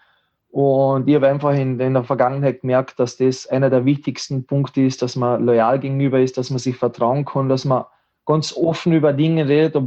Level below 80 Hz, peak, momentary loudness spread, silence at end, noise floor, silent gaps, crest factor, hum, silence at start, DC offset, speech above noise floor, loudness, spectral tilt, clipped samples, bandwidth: -64 dBFS; -4 dBFS; 6 LU; 0 s; -61 dBFS; none; 14 dB; none; 0.55 s; under 0.1%; 44 dB; -18 LUFS; -7 dB/octave; under 0.1%; 8.2 kHz